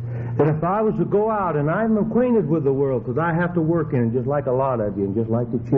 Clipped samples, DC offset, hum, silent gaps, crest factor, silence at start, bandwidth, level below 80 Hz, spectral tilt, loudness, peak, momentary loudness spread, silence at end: under 0.1%; under 0.1%; none; none; 16 dB; 0 s; 3.7 kHz; -48 dBFS; -9.5 dB/octave; -21 LUFS; -4 dBFS; 4 LU; 0 s